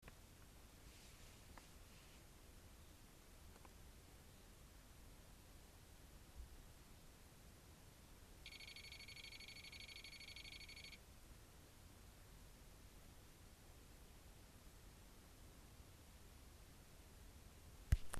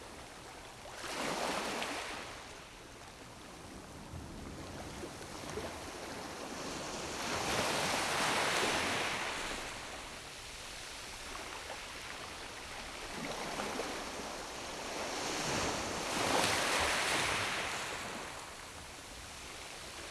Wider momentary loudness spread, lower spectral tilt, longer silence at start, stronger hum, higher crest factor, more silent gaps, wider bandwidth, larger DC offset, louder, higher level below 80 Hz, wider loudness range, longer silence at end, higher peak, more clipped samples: second, 10 LU vs 17 LU; first, -3.5 dB/octave vs -2 dB/octave; about the same, 0 s vs 0 s; neither; first, 32 dB vs 22 dB; neither; first, 14 kHz vs 12 kHz; neither; second, -60 LUFS vs -37 LUFS; about the same, -58 dBFS vs -58 dBFS; second, 8 LU vs 11 LU; about the same, 0 s vs 0 s; second, -24 dBFS vs -16 dBFS; neither